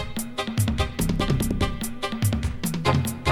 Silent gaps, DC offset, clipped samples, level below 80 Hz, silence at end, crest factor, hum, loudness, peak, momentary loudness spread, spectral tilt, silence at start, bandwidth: none; under 0.1%; under 0.1%; -34 dBFS; 0 s; 18 dB; none; -25 LUFS; -6 dBFS; 6 LU; -5 dB/octave; 0 s; 17 kHz